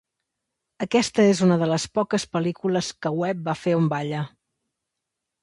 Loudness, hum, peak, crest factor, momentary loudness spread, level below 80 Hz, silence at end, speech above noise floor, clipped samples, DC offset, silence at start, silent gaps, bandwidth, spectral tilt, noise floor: -23 LUFS; none; -6 dBFS; 18 dB; 9 LU; -62 dBFS; 1.15 s; 61 dB; under 0.1%; under 0.1%; 0.8 s; none; 11.5 kHz; -5.5 dB/octave; -83 dBFS